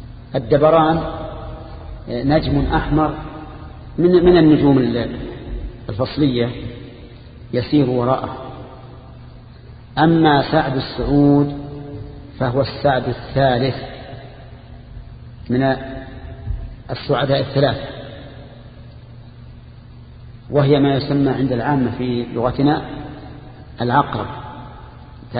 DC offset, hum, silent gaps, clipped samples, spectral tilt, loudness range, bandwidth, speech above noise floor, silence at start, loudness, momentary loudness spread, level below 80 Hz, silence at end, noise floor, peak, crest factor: under 0.1%; none; none; under 0.1%; -12.5 dB/octave; 7 LU; 5 kHz; 23 dB; 0 s; -17 LUFS; 25 LU; -36 dBFS; 0 s; -39 dBFS; 0 dBFS; 18 dB